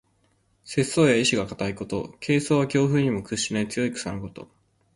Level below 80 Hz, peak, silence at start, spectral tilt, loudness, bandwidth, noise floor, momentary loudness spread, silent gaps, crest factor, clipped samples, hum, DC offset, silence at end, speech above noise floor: -54 dBFS; -6 dBFS; 0.65 s; -5 dB/octave; -24 LUFS; 11.5 kHz; -66 dBFS; 12 LU; none; 18 dB; under 0.1%; none; under 0.1%; 0.5 s; 42 dB